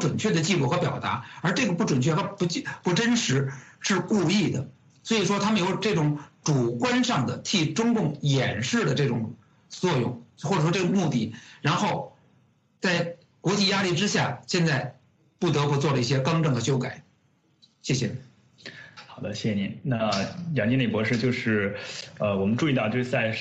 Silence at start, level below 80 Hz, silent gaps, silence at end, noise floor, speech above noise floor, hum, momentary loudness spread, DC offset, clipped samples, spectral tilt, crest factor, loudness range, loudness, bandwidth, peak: 0 s; -64 dBFS; none; 0 s; -65 dBFS; 40 dB; none; 11 LU; under 0.1%; under 0.1%; -5 dB/octave; 16 dB; 4 LU; -25 LUFS; 8.4 kHz; -10 dBFS